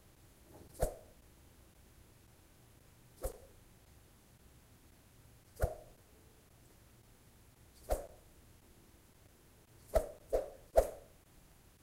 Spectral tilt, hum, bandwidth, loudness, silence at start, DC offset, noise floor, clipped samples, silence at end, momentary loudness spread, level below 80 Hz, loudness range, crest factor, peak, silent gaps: -5.5 dB/octave; none; 16 kHz; -39 LUFS; 0.55 s; under 0.1%; -63 dBFS; under 0.1%; 0.8 s; 26 LU; -50 dBFS; 15 LU; 32 dB; -12 dBFS; none